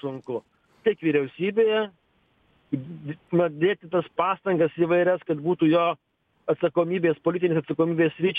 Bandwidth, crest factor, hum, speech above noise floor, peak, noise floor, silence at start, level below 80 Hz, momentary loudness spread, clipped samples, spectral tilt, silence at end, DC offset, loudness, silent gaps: 3.9 kHz; 16 dB; none; 42 dB; -8 dBFS; -66 dBFS; 0.05 s; -68 dBFS; 12 LU; under 0.1%; -9 dB/octave; 0 s; under 0.1%; -24 LUFS; none